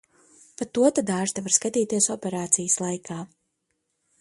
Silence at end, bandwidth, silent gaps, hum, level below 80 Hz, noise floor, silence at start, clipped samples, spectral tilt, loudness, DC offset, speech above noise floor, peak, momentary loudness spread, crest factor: 0.95 s; 11.5 kHz; none; none; -68 dBFS; -76 dBFS; 0.6 s; under 0.1%; -3.5 dB/octave; -23 LUFS; under 0.1%; 52 dB; -4 dBFS; 14 LU; 22 dB